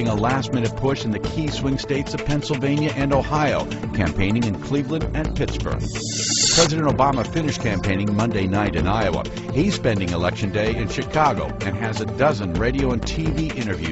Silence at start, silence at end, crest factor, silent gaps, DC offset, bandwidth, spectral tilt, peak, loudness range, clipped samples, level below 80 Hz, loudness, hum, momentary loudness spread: 0 s; 0 s; 18 dB; none; under 0.1%; 8.2 kHz; -4.5 dB/octave; -2 dBFS; 3 LU; under 0.1%; -34 dBFS; -21 LUFS; none; 6 LU